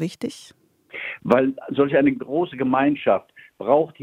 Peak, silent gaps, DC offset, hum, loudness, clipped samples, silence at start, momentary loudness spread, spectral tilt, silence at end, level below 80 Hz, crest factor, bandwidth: -2 dBFS; none; under 0.1%; none; -21 LUFS; under 0.1%; 0 s; 13 LU; -7 dB/octave; 0.1 s; -62 dBFS; 20 dB; 11.5 kHz